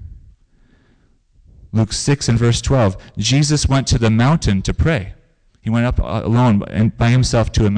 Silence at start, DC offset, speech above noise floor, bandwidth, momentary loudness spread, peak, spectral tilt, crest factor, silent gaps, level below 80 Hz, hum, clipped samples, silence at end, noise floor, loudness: 0 s; under 0.1%; 40 dB; 10 kHz; 6 LU; -8 dBFS; -5.5 dB/octave; 10 dB; none; -28 dBFS; none; under 0.1%; 0 s; -55 dBFS; -16 LUFS